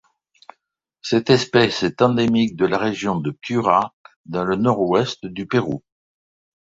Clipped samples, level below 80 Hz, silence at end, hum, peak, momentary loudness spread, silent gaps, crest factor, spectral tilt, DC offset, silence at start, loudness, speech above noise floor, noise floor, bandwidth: under 0.1%; -54 dBFS; 0.85 s; none; 0 dBFS; 12 LU; 3.93-4.04 s, 4.16-4.24 s; 20 dB; -6 dB/octave; under 0.1%; 1.05 s; -20 LUFS; 55 dB; -74 dBFS; 8 kHz